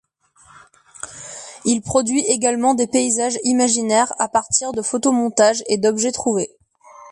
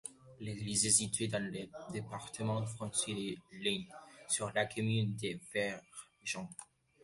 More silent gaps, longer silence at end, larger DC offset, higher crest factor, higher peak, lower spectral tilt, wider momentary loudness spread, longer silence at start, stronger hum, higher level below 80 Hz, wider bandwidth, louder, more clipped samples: neither; second, 0 s vs 0.4 s; neither; second, 16 dB vs 24 dB; first, -2 dBFS vs -14 dBFS; about the same, -3 dB/octave vs -3.5 dB/octave; second, 14 LU vs 18 LU; first, 1.05 s vs 0.05 s; neither; first, -56 dBFS vs -68 dBFS; about the same, 11.5 kHz vs 12 kHz; first, -18 LUFS vs -36 LUFS; neither